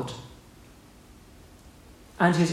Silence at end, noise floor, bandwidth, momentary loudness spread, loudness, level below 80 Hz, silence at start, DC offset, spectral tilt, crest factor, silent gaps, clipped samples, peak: 0 s; -51 dBFS; 13.5 kHz; 28 LU; -25 LUFS; -56 dBFS; 0 s; under 0.1%; -6 dB/octave; 22 dB; none; under 0.1%; -8 dBFS